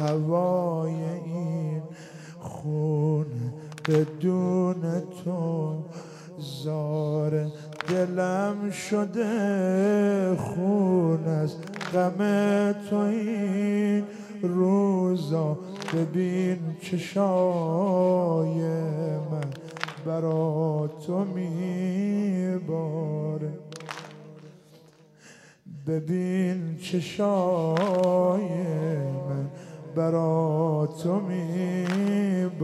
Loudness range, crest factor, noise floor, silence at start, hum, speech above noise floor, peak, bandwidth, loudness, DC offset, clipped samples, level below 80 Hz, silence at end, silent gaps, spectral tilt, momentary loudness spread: 5 LU; 18 dB; -54 dBFS; 0 s; none; 29 dB; -8 dBFS; 12.5 kHz; -27 LUFS; under 0.1%; under 0.1%; -72 dBFS; 0 s; none; -7.5 dB/octave; 12 LU